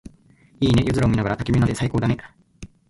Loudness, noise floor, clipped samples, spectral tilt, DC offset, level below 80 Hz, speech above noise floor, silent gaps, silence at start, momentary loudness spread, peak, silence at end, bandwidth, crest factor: -21 LUFS; -54 dBFS; under 0.1%; -7 dB/octave; under 0.1%; -38 dBFS; 34 dB; none; 0.05 s; 6 LU; -6 dBFS; 0.25 s; 11.5 kHz; 16 dB